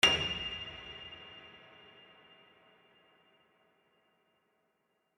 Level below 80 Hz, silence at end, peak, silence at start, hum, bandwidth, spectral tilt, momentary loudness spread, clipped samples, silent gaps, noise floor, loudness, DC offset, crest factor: -62 dBFS; 3.6 s; -10 dBFS; 0.05 s; none; 12.5 kHz; -1.5 dB/octave; 26 LU; under 0.1%; none; -79 dBFS; -35 LUFS; under 0.1%; 30 dB